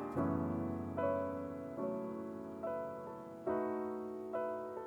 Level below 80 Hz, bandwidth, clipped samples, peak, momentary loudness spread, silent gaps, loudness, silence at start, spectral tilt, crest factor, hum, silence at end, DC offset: -72 dBFS; over 20 kHz; under 0.1%; -24 dBFS; 8 LU; none; -40 LUFS; 0 s; -9 dB/octave; 16 dB; none; 0 s; under 0.1%